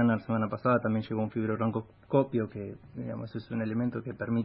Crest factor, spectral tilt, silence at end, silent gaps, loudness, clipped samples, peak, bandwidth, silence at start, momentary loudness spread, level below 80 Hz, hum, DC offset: 20 dB; -12 dB/octave; 0 s; none; -31 LUFS; under 0.1%; -12 dBFS; 5.4 kHz; 0 s; 11 LU; -64 dBFS; none; under 0.1%